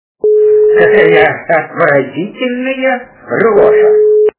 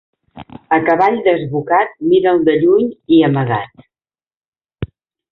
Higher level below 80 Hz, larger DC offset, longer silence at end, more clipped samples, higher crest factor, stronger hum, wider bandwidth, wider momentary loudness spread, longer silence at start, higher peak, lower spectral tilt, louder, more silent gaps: about the same, -48 dBFS vs -48 dBFS; neither; second, 0.1 s vs 0.45 s; first, 0.6% vs under 0.1%; about the same, 10 dB vs 14 dB; neither; second, 4 kHz vs 4.7 kHz; second, 10 LU vs 18 LU; about the same, 0.25 s vs 0.35 s; about the same, 0 dBFS vs 0 dBFS; about the same, -9.5 dB/octave vs -9.5 dB/octave; first, -10 LUFS vs -14 LUFS; second, none vs 4.37-4.53 s